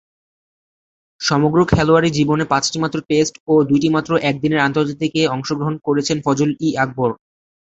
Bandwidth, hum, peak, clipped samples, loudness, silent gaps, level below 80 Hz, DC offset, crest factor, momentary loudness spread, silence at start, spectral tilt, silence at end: 8.2 kHz; none; -2 dBFS; under 0.1%; -17 LUFS; 3.40-3.46 s; -44 dBFS; under 0.1%; 16 dB; 7 LU; 1.2 s; -5.5 dB/octave; 0.6 s